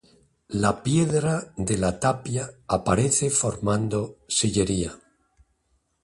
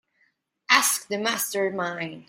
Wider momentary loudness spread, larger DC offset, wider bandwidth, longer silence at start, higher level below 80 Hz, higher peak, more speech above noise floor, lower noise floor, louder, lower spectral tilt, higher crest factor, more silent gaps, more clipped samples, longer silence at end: about the same, 8 LU vs 10 LU; neither; second, 11.5 kHz vs 16.5 kHz; second, 0.5 s vs 0.7 s; first, -46 dBFS vs -74 dBFS; second, -8 dBFS vs -2 dBFS; first, 46 dB vs 41 dB; about the same, -70 dBFS vs -69 dBFS; about the same, -24 LUFS vs -23 LUFS; first, -4.5 dB/octave vs -1.5 dB/octave; second, 18 dB vs 24 dB; neither; neither; first, 1.05 s vs 0.05 s